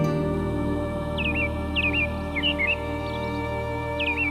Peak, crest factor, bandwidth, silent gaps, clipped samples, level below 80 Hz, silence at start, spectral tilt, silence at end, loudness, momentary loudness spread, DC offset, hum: -12 dBFS; 14 dB; 13.5 kHz; none; under 0.1%; -36 dBFS; 0 s; -6.5 dB/octave; 0 s; -25 LUFS; 6 LU; under 0.1%; none